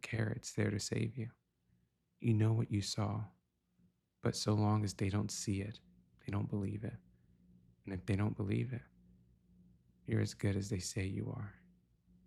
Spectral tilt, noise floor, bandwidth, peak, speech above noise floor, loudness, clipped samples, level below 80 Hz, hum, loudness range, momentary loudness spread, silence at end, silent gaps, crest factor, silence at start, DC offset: -6 dB/octave; -77 dBFS; 13 kHz; -22 dBFS; 40 dB; -38 LUFS; under 0.1%; -66 dBFS; none; 5 LU; 14 LU; 0.75 s; none; 16 dB; 0.05 s; under 0.1%